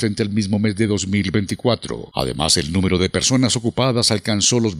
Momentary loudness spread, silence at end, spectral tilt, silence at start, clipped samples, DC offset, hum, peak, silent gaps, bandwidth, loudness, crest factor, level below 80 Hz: 5 LU; 0 s; -4 dB/octave; 0 s; under 0.1%; under 0.1%; none; -2 dBFS; none; 14 kHz; -18 LUFS; 16 dB; -44 dBFS